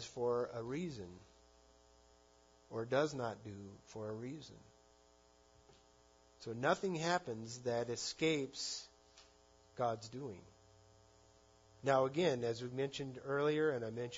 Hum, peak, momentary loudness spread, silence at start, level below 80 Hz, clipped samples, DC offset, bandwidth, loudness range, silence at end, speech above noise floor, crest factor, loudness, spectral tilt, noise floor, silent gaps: none; -20 dBFS; 17 LU; 0 s; -74 dBFS; under 0.1%; under 0.1%; 7.4 kHz; 8 LU; 0 s; 29 dB; 22 dB; -39 LUFS; -4 dB/octave; -68 dBFS; none